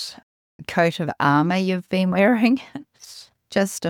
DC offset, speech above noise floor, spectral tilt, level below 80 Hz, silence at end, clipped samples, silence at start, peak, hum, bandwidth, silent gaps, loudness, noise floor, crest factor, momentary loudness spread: under 0.1%; 25 dB; -5.5 dB/octave; -62 dBFS; 0 s; under 0.1%; 0 s; -6 dBFS; none; 17 kHz; 0.23-0.59 s; -20 LUFS; -45 dBFS; 16 dB; 21 LU